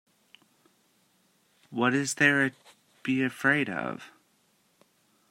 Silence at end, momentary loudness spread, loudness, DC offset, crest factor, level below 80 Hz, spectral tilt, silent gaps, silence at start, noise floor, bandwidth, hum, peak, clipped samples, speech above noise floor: 1.25 s; 15 LU; -27 LUFS; under 0.1%; 24 dB; -76 dBFS; -4 dB/octave; none; 1.7 s; -68 dBFS; 16 kHz; none; -8 dBFS; under 0.1%; 42 dB